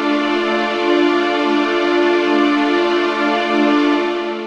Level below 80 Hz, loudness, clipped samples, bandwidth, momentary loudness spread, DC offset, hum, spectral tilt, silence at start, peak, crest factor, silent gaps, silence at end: -60 dBFS; -15 LUFS; under 0.1%; 8.6 kHz; 2 LU; under 0.1%; none; -4 dB/octave; 0 s; -4 dBFS; 12 dB; none; 0 s